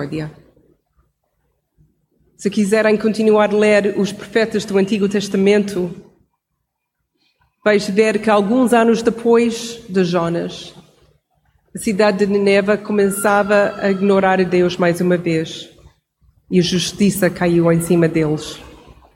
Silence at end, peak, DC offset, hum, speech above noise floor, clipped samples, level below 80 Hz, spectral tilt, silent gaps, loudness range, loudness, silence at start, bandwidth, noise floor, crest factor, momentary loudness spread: 0.4 s; -2 dBFS; under 0.1%; none; 59 dB; under 0.1%; -52 dBFS; -5.5 dB/octave; none; 4 LU; -16 LUFS; 0 s; 17 kHz; -74 dBFS; 16 dB; 11 LU